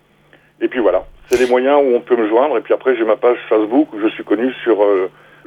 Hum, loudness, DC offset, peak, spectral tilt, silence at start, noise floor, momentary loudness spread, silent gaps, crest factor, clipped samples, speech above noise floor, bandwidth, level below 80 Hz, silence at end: none; -15 LUFS; under 0.1%; -2 dBFS; -5 dB/octave; 0.6 s; -51 dBFS; 7 LU; none; 14 dB; under 0.1%; 36 dB; 16 kHz; -50 dBFS; 0.4 s